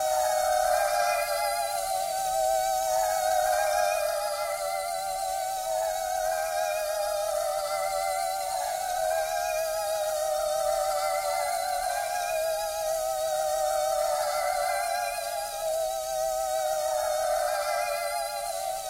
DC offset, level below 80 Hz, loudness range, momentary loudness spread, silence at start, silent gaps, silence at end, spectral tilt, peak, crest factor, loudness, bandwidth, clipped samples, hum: under 0.1%; -56 dBFS; 2 LU; 5 LU; 0 s; none; 0 s; 0.5 dB/octave; -14 dBFS; 14 dB; -28 LUFS; 16 kHz; under 0.1%; none